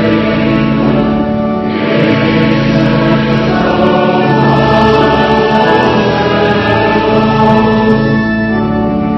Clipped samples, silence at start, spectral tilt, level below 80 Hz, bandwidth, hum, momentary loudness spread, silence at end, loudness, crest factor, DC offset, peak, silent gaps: 0.4%; 0 s; -7.5 dB/octave; -30 dBFS; 6.2 kHz; none; 4 LU; 0 s; -10 LUFS; 10 dB; under 0.1%; 0 dBFS; none